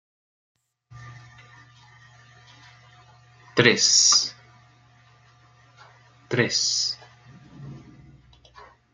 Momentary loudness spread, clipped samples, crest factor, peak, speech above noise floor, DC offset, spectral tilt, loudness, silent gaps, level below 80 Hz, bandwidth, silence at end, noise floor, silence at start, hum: 29 LU; under 0.1%; 26 dB; -2 dBFS; 36 dB; under 0.1%; -1.5 dB/octave; -19 LUFS; none; -64 dBFS; 12 kHz; 1.15 s; -56 dBFS; 0.95 s; none